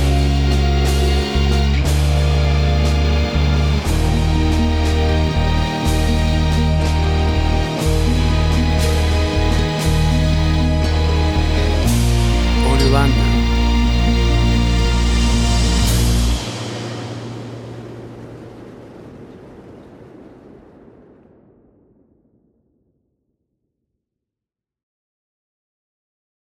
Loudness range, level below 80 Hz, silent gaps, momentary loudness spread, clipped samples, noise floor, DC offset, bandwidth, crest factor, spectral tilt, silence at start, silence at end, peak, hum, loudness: 11 LU; -20 dBFS; none; 13 LU; under 0.1%; -87 dBFS; under 0.1%; 19 kHz; 16 dB; -5.5 dB/octave; 0 s; 6.3 s; 0 dBFS; none; -17 LUFS